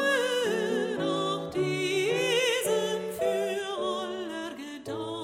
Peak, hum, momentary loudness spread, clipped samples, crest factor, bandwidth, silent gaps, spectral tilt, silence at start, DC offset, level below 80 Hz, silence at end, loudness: -16 dBFS; none; 11 LU; under 0.1%; 14 dB; 16 kHz; none; -3.5 dB/octave; 0 s; under 0.1%; -68 dBFS; 0 s; -29 LUFS